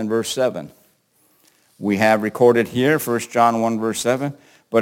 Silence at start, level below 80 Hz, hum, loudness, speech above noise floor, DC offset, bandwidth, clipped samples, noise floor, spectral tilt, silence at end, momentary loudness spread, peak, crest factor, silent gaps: 0 s; -66 dBFS; none; -19 LUFS; 42 dB; under 0.1%; 17 kHz; under 0.1%; -61 dBFS; -5 dB/octave; 0 s; 8 LU; -2 dBFS; 18 dB; none